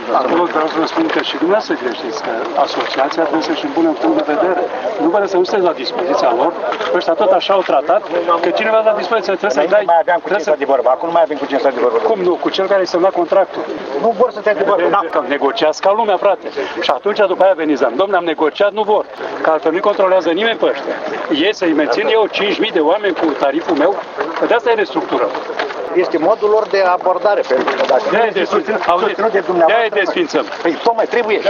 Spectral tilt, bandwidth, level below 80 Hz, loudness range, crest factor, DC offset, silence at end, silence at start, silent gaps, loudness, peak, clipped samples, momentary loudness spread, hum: -4.5 dB/octave; 7.2 kHz; -62 dBFS; 2 LU; 14 dB; under 0.1%; 0 s; 0 s; none; -15 LUFS; 0 dBFS; under 0.1%; 5 LU; none